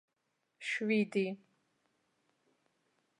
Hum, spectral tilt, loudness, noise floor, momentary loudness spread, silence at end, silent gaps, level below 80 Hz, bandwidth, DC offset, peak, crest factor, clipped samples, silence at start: none; -5.5 dB/octave; -35 LUFS; -83 dBFS; 12 LU; 1.85 s; none; -90 dBFS; 11 kHz; under 0.1%; -20 dBFS; 20 dB; under 0.1%; 0.6 s